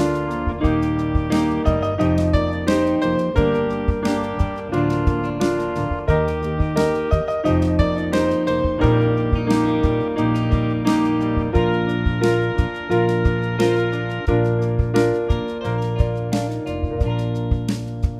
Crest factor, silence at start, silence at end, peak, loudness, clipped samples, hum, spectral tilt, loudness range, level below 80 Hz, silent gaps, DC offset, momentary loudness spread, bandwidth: 16 dB; 0 s; 0 s; -2 dBFS; -20 LUFS; under 0.1%; none; -7.5 dB/octave; 2 LU; -28 dBFS; none; under 0.1%; 5 LU; 13 kHz